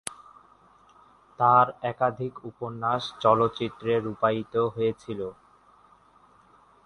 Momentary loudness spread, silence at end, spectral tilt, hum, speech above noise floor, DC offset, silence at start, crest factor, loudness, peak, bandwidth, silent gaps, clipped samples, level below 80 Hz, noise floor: 15 LU; 1.55 s; -6 dB/octave; none; 33 dB; under 0.1%; 0.05 s; 22 dB; -26 LUFS; -6 dBFS; 11.5 kHz; none; under 0.1%; -64 dBFS; -58 dBFS